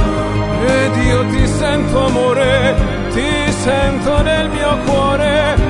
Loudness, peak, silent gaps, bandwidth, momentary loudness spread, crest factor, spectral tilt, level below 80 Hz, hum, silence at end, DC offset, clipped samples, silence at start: -14 LUFS; 0 dBFS; none; 11 kHz; 3 LU; 14 dB; -5.5 dB/octave; -22 dBFS; none; 0 s; under 0.1%; under 0.1%; 0 s